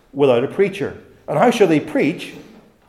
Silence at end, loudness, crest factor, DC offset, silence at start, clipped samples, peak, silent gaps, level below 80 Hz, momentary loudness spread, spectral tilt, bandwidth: 0.45 s; -17 LUFS; 16 dB; under 0.1%; 0.15 s; under 0.1%; -2 dBFS; none; -58 dBFS; 15 LU; -6 dB/octave; 13.5 kHz